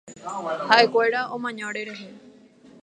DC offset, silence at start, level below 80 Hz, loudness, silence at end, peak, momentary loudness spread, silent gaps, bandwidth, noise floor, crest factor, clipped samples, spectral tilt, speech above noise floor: under 0.1%; 0.05 s; -76 dBFS; -22 LUFS; 0.55 s; 0 dBFS; 18 LU; none; 10.5 kHz; -51 dBFS; 24 dB; under 0.1%; -3 dB/octave; 28 dB